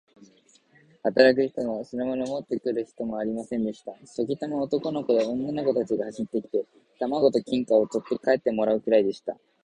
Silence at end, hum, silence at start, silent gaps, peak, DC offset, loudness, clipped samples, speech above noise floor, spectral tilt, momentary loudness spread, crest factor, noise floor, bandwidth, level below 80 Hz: 0.3 s; none; 1.05 s; none; -4 dBFS; under 0.1%; -26 LUFS; under 0.1%; 34 dB; -6 dB/octave; 10 LU; 22 dB; -60 dBFS; 9.8 kHz; -66 dBFS